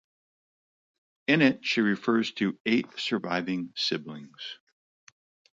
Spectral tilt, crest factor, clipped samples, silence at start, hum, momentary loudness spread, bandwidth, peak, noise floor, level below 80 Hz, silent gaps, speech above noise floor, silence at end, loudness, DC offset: -5 dB/octave; 22 dB; under 0.1%; 1.3 s; none; 18 LU; 7.8 kHz; -8 dBFS; under -90 dBFS; -74 dBFS; 2.60-2.65 s; over 63 dB; 1.05 s; -27 LUFS; under 0.1%